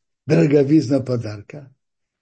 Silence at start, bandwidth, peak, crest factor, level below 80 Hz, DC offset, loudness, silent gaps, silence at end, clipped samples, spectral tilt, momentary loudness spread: 0.25 s; 8.6 kHz; -4 dBFS; 14 dB; -60 dBFS; under 0.1%; -17 LUFS; none; 0.55 s; under 0.1%; -8 dB/octave; 15 LU